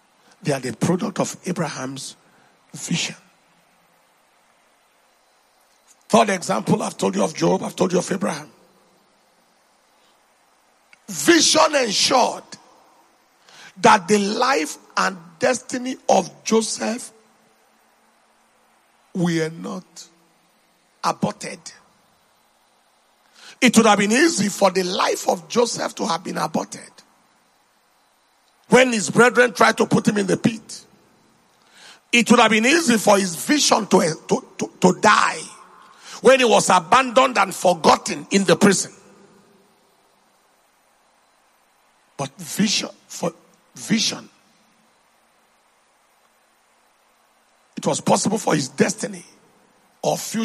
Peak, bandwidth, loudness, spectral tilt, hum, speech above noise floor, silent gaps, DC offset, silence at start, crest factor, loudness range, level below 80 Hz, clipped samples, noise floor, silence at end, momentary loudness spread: 0 dBFS; 13 kHz; -19 LUFS; -3.5 dB/octave; none; 42 dB; none; under 0.1%; 0.45 s; 22 dB; 13 LU; -66 dBFS; under 0.1%; -61 dBFS; 0 s; 17 LU